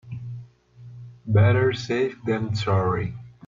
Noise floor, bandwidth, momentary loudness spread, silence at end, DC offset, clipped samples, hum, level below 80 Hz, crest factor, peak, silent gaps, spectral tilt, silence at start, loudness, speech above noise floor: -46 dBFS; 7.4 kHz; 21 LU; 0.2 s; under 0.1%; under 0.1%; 60 Hz at -40 dBFS; -52 dBFS; 16 dB; -8 dBFS; none; -7.5 dB/octave; 0.05 s; -23 LUFS; 25 dB